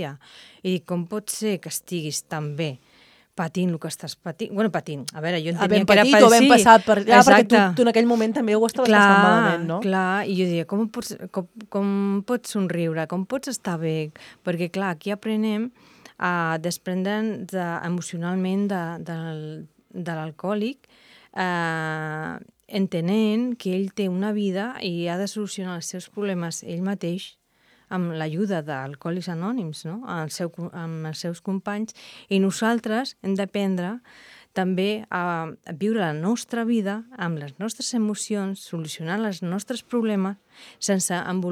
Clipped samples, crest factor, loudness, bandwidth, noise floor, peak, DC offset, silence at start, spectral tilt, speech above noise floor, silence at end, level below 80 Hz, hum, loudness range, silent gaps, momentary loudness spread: under 0.1%; 22 dB; -23 LUFS; 16 kHz; -61 dBFS; 0 dBFS; under 0.1%; 0 s; -5 dB/octave; 38 dB; 0 s; -66 dBFS; none; 14 LU; none; 17 LU